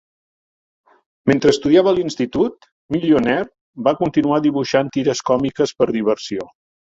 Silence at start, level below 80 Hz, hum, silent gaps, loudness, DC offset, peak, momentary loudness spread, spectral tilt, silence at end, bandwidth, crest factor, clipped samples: 1.25 s; -52 dBFS; none; 2.72-2.89 s, 3.61-3.73 s; -18 LUFS; under 0.1%; -2 dBFS; 9 LU; -5.5 dB/octave; 0.4 s; 7.8 kHz; 16 dB; under 0.1%